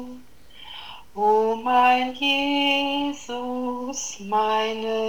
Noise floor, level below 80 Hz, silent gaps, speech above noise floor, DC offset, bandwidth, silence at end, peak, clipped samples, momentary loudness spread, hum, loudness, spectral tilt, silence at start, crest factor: -48 dBFS; -58 dBFS; none; 25 dB; 0.6%; over 20 kHz; 0 s; -8 dBFS; under 0.1%; 19 LU; none; -22 LUFS; -2 dB/octave; 0 s; 16 dB